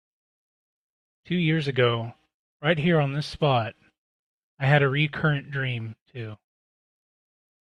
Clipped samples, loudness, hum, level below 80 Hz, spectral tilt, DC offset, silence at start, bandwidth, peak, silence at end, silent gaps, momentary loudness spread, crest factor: under 0.1%; -25 LUFS; none; -60 dBFS; -7.5 dB/octave; under 0.1%; 1.3 s; 9.8 kHz; -6 dBFS; 1.3 s; 2.34-2.60 s, 3.98-4.57 s, 6.01-6.06 s; 17 LU; 22 dB